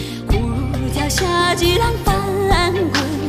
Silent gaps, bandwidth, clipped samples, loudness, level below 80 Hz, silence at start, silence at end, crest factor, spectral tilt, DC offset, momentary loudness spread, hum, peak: none; 15.5 kHz; under 0.1%; -17 LUFS; -26 dBFS; 0 s; 0 s; 16 dB; -4.5 dB/octave; under 0.1%; 6 LU; none; -2 dBFS